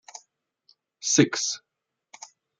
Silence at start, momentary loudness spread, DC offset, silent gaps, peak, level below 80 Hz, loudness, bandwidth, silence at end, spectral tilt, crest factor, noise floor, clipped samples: 0.15 s; 25 LU; under 0.1%; none; -4 dBFS; -76 dBFS; -24 LUFS; 10 kHz; 1 s; -3 dB/octave; 26 dB; -71 dBFS; under 0.1%